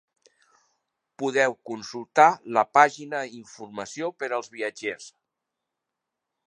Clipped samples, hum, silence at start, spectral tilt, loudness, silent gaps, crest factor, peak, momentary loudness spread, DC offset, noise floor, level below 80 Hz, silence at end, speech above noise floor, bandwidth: under 0.1%; none; 1.2 s; -3.5 dB/octave; -24 LUFS; none; 24 dB; -2 dBFS; 18 LU; under 0.1%; -85 dBFS; -80 dBFS; 1.4 s; 60 dB; 10 kHz